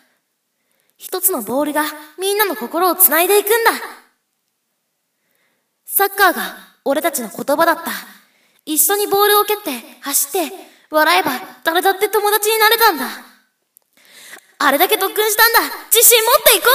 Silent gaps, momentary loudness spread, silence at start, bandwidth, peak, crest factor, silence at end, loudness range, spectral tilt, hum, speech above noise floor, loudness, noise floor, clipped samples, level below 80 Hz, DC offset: none; 15 LU; 1 s; over 20 kHz; 0 dBFS; 16 dB; 0 s; 4 LU; 0 dB/octave; none; 55 dB; -14 LUFS; -70 dBFS; under 0.1%; -60 dBFS; under 0.1%